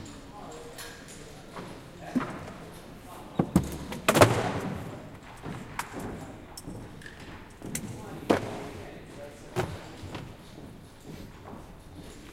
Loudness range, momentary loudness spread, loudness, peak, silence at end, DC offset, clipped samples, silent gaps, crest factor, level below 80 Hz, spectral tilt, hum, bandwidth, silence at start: 12 LU; 18 LU; -31 LUFS; -2 dBFS; 0 s; under 0.1%; under 0.1%; none; 30 dB; -50 dBFS; -5 dB/octave; none; 16.5 kHz; 0 s